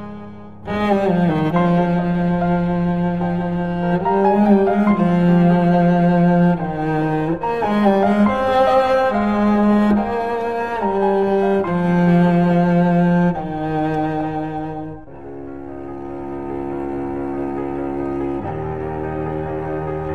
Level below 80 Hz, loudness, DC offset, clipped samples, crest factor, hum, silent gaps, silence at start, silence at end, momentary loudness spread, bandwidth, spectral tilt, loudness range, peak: -42 dBFS; -18 LUFS; 0.9%; under 0.1%; 14 dB; none; none; 0 s; 0 s; 13 LU; 4.8 kHz; -9.5 dB/octave; 10 LU; -2 dBFS